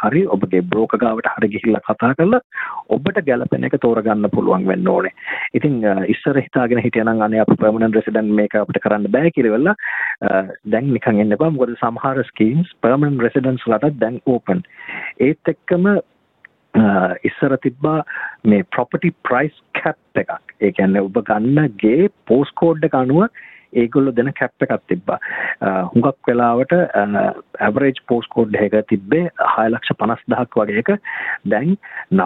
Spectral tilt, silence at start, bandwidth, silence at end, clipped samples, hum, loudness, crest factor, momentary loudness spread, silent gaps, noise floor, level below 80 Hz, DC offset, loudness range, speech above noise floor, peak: -10.5 dB/octave; 0 s; 4.1 kHz; 0 s; under 0.1%; none; -17 LUFS; 14 dB; 6 LU; 2.44-2.50 s; -51 dBFS; -56 dBFS; under 0.1%; 2 LU; 34 dB; -2 dBFS